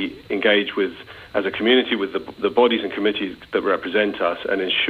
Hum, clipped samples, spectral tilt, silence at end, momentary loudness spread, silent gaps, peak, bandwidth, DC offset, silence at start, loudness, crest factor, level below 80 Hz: none; under 0.1%; -6 dB/octave; 0 s; 9 LU; none; -4 dBFS; 5 kHz; under 0.1%; 0 s; -21 LUFS; 18 dB; -58 dBFS